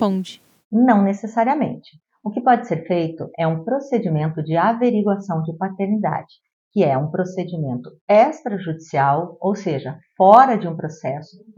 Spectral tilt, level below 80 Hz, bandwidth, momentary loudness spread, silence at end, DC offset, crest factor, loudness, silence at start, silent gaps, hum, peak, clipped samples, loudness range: -8 dB/octave; -68 dBFS; 7.8 kHz; 12 LU; 0.05 s; under 0.1%; 20 dB; -19 LUFS; 0 s; 0.65-0.71 s, 6.53-6.71 s, 8.01-8.07 s; none; 0 dBFS; under 0.1%; 4 LU